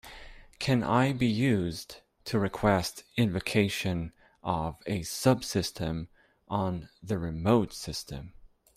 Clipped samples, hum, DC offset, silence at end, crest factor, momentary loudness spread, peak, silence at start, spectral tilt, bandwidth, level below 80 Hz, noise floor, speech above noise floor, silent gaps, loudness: under 0.1%; none; under 0.1%; 0.3 s; 20 dB; 15 LU; -10 dBFS; 0.05 s; -5.5 dB/octave; 16 kHz; -52 dBFS; -48 dBFS; 20 dB; none; -29 LUFS